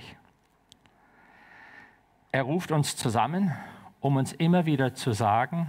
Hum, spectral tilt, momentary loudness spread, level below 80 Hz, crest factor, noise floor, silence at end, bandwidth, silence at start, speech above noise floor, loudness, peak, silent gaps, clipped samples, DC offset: none; -6 dB/octave; 12 LU; -66 dBFS; 18 dB; -64 dBFS; 0 s; 16 kHz; 0 s; 38 dB; -27 LUFS; -12 dBFS; none; under 0.1%; under 0.1%